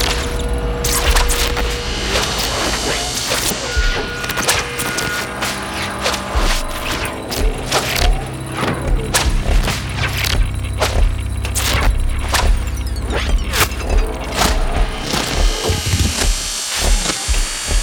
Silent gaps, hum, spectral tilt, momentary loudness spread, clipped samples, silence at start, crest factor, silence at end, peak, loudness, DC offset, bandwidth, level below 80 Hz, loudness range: none; none; -3 dB/octave; 5 LU; under 0.1%; 0 s; 16 dB; 0 s; -2 dBFS; -18 LUFS; under 0.1%; over 20 kHz; -20 dBFS; 2 LU